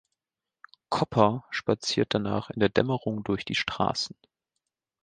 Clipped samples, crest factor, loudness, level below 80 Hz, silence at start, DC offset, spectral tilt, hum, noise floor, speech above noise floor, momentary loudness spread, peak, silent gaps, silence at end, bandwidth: under 0.1%; 24 dB; -27 LUFS; -58 dBFS; 0.9 s; under 0.1%; -5 dB/octave; none; -89 dBFS; 62 dB; 7 LU; -4 dBFS; none; 0.95 s; 9.6 kHz